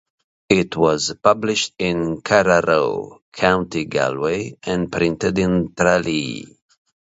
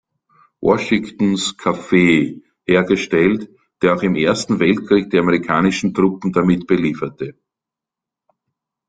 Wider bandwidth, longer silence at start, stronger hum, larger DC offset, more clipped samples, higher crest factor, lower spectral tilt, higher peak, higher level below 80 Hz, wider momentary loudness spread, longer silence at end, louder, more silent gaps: second, 8 kHz vs 9.4 kHz; about the same, 0.5 s vs 0.6 s; neither; neither; neither; about the same, 20 dB vs 16 dB; second, -4.5 dB/octave vs -6 dB/octave; about the same, 0 dBFS vs -2 dBFS; first, -46 dBFS vs -52 dBFS; about the same, 8 LU vs 8 LU; second, 0.7 s vs 1.6 s; about the same, -19 LUFS vs -17 LUFS; first, 3.22-3.32 s vs none